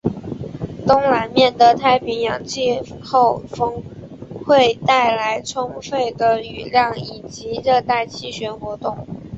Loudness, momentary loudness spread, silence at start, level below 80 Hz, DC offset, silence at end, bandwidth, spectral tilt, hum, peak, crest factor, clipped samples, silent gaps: -18 LUFS; 16 LU; 0.05 s; -48 dBFS; under 0.1%; 0 s; 8 kHz; -4.5 dB/octave; none; -2 dBFS; 16 dB; under 0.1%; none